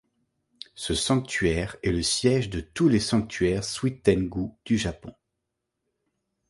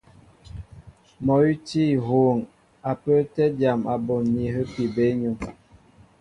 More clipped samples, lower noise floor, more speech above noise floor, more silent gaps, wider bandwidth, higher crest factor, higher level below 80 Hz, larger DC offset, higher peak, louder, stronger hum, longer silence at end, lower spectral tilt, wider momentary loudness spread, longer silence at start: neither; first, -82 dBFS vs -53 dBFS; first, 57 dB vs 31 dB; neither; about the same, 11.5 kHz vs 10.5 kHz; first, 22 dB vs 16 dB; first, -44 dBFS vs -50 dBFS; neither; about the same, -6 dBFS vs -8 dBFS; about the same, -25 LUFS vs -23 LUFS; neither; first, 1.4 s vs 0.7 s; second, -5 dB/octave vs -8.5 dB/octave; second, 10 LU vs 18 LU; first, 0.75 s vs 0.55 s